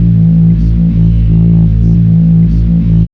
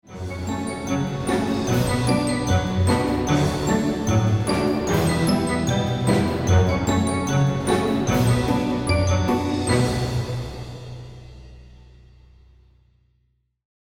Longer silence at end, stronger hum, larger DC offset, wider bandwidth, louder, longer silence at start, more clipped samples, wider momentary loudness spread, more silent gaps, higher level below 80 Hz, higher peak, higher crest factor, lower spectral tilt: second, 0.05 s vs 2.25 s; second, none vs 60 Hz at -50 dBFS; first, 0.8% vs 0.2%; second, 3.1 kHz vs 17 kHz; first, -8 LUFS vs -22 LUFS; about the same, 0 s vs 0.1 s; first, 0.8% vs under 0.1%; second, 2 LU vs 9 LU; neither; first, -14 dBFS vs -40 dBFS; first, 0 dBFS vs -6 dBFS; second, 6 dB vs 16 dB; first, -12 dB/octave vs -6 dB/octave